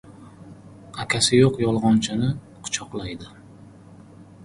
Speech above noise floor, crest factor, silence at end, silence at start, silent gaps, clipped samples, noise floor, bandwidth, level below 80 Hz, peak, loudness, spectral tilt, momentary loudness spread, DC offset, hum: 25 dB; 20 dB; 0.2 s; 0.05 s; none; under 0.1%; -46 dBFS; 11.5 kHz; -50 dBFS; -4 dBFS; -21 LUFS; -4.5 dB/octave; 19 LU; under 0.1%; none